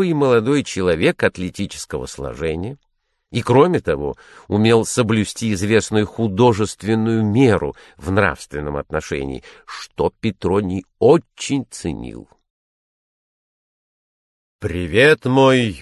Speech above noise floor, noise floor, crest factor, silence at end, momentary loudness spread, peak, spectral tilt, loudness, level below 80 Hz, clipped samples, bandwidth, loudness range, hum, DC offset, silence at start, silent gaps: over 72 dB; under -90 dBFS; 18 dB; 0 s; 14 LU; -2 dBFS; -5.5 dB/octave; -18 LUFS; -40 dBFS; under 0.1%; 12.5 kHz; 5 LU; none; under 0.1%; 0 s; 12.50-14.59 s